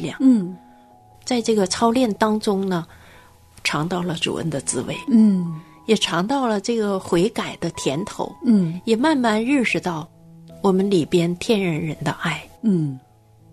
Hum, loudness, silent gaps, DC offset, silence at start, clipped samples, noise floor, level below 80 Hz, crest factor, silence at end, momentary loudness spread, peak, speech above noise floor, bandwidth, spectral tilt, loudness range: none; -21 LUFS; none; under 0.1%; 0 s; under 0.1%; -49 dBFS; -56 dBFS; 18 dB; 0.55 s; 10 LU; -4 dBFS; 29 dB; 13.5 kHz; -5 dB/octave; 2 LU